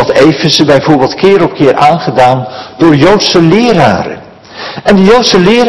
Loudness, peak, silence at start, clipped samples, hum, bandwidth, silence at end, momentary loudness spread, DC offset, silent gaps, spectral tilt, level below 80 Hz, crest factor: -6 LUFS; 0 dBFS; 0 s; 9%; none; 12 kHz; 0 s; 10 LU; under 0.1%; none; -5.5 dB/octave; -36 dBFS; 6 dB